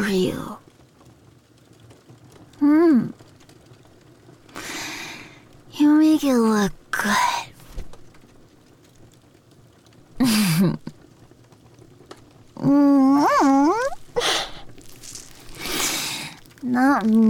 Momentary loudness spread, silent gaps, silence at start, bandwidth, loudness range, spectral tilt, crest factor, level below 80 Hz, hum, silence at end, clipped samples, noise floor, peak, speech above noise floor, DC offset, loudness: 23 LU; none; 0 s; 18.5 kHz; 6 LU; -4.5 dB/octave; 14 dB; -50 dBFS; none; 0 s; under 0.1%; -52 dBFS; -10 dBFS; 35 dB; under 0.1%; -20 LUFS